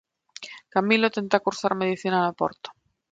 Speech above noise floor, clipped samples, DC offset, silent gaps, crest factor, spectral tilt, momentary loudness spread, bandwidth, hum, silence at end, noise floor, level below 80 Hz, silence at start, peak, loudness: 20 dB; under 0.1%; under 0.1%; none; 22 dB; -5 dB/octave; 19 LU; 9 kHz; none; 0.4 s; -44 dBFS; -70 dBFS; 0.4 s; -4 dBFS; -24 LUFS